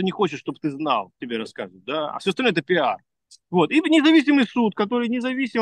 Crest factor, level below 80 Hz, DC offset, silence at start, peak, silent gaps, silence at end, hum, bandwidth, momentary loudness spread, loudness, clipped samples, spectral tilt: 16 dB; -72 dBFS; under 0.1%; 0 s; -6 dBFS; none; 0 s; none; 10 kHz; 13 LU; -21 LUFS; under 0.1%; -5.5 dB/octave